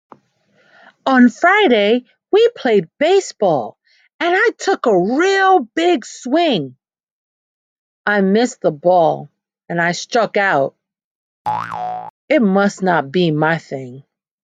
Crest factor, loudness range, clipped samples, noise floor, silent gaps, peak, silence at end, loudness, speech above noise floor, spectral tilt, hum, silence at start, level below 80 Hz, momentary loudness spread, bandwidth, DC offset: 16 dB; 4 LU; under 0.1%; -58 dBFS; 4.14-4.19 s, 7.03-8.04 s, 11.04-11.45 s, 12.10-12.28 s; 0 dBFS; 0.45 s; -16 LUFS; 43 dB; -5 dB/octave; none; 1.05 s; -68 dBFS; 12 LU; 9.2 kHz; under 0.1%